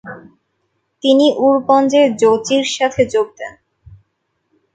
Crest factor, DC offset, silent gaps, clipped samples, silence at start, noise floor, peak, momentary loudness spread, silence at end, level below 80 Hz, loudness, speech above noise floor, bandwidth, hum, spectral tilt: 16 dB; under 0.1%; none; under 0.1%; 0.05 s; -69 dBFS; 0 dBFS; 14 LU; 1.25 s; -56 dBFS; -14 LUFS; 56 dB; 9.2 kHz; none; -4 dB/octave